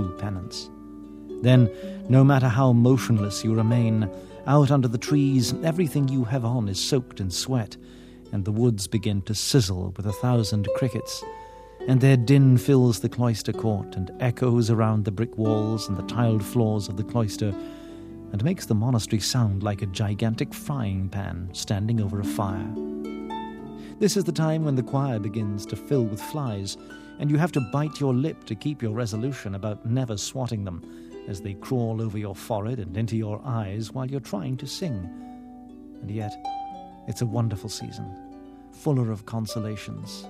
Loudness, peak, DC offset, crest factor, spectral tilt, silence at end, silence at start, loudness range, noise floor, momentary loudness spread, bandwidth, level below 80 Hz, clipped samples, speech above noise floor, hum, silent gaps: -25 LUFS; -4 dBFS; under 0.1%; 20 dB; -6.5 dB/octave; 0 s; 0 s; 9 LU; -44 dBFS; 16 LU; 15 kHz; -54 dBFS; under 0.1%; 21 dB; none; none